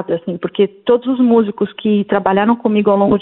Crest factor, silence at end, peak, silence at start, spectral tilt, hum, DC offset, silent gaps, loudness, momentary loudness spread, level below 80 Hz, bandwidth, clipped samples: 14 dB; 0 s; 0 dBFS; 0 s; -11.5 dB/octave; none; under 0.1%; none; -15 LUFS; 7 LU; -52 dBFS; 4.1 kHz; under 0.1%